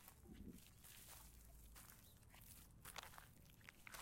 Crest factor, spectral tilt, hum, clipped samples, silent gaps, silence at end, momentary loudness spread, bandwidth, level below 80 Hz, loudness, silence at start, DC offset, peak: 28 dB; -3 dB/octave; none; under 0.1%; none; 0 s; 8 LU; 16.5 kHz; -70 dBFS; -61 LUFS; 0 s; under 0.1%; -32 dBFS